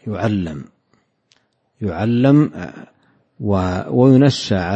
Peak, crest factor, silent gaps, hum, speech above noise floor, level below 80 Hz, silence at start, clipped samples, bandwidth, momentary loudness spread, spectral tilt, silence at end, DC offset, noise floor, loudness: 0 dBFS; 16 dB; none; none; 47 dB; -48 dBFS; 0.05 s; under 0.1%; 8.4 kHz; 16 LU; -7.5 dB/octave; 0 s; under 0.1%; -63 dBFS; -16 LUFS